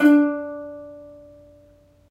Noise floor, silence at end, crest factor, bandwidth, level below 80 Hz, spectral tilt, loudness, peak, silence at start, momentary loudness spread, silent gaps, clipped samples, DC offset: -54 dBFS; 1.05 s; 18 dB; 13.5 kHz; -64 dBFS; -6 dB/octave; -21 LUFS; -4 dBFS; 0 s; 26 LU; none; under 0.1%; under 0.1%